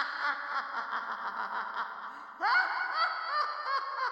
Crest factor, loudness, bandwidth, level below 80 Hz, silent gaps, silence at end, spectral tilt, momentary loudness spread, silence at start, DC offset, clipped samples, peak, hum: 18 dB; -32 LUFS; 16 kHz; -84 dBFS; none; 0 s; -1 dB/octave; 9 LU; 0 s; under 0.1%; under 0.1%; -16 dBFS; none